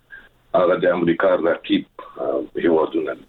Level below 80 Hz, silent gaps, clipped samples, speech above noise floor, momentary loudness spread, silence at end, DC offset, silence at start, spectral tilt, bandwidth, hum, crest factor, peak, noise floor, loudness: -56 dBFS; none; under 0.1%; 26 dB; 7 LU; 0.1 s; under 0.1%; 0.1 s; -8.5 dB/octave; 4.3 kHz; none; 14 dB; -6 dBFS; -46 dBFS; -20 LUFS